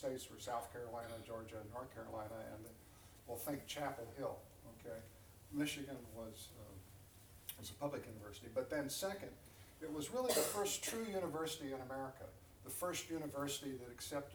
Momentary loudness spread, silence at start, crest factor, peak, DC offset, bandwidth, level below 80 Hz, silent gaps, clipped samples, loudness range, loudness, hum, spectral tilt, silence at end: 17 LU; 0 s; 24 dB; -22 dBFS; under 0.1%; over 20 kHz; -68 dBFS; none; under 0.1%; 8 LU; -45 LUFS; none; -3.5 dB/octave; 0 s